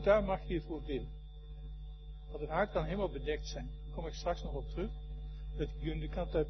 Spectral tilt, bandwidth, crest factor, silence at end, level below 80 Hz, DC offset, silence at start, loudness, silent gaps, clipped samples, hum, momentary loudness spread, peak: -5.5 dB/octave; 6.2 kHz; 22 dB; 0 s; -44 dBFS; under 0.1%; 0 s; -39 LUFS; none; under 0.1%; none; 15 LU; -14 dBFS